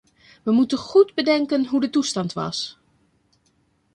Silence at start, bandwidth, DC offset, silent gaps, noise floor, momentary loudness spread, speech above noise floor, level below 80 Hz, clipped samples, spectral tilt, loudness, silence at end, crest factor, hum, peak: 0.45 s; 10.5 kHz; under 0.1%; none; -65 dBFS; 10 LU; 45 dB; -64 dBFS; under 0.1%; -4.5 dB/octave; -21 LUFS; 1.25 s; 18 dB; none; -4 dBFS